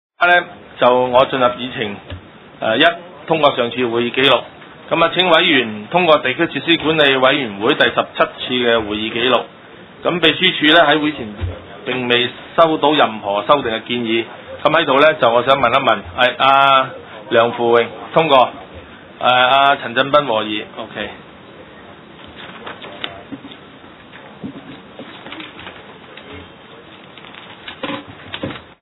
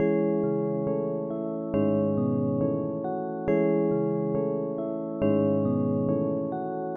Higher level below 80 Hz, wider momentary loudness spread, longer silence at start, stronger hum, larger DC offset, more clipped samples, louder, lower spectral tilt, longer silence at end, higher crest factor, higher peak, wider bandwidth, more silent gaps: first, -50 dBFS vs -60 dBFS; first, 22 LU vs 7 LU; first, 0.2 s vs 0 s; neither; neither; neither; first, -14 LUFS vs -27 LUFS; second, -7 dB/octave vs -12 dB/octave; first, 0.2 s vs 0 s; about the same, 16 dB vs 14 dB; first, 0 dBFS vs -12 dBFS; first, 5.4 kHz vs 3.5 kHz; neither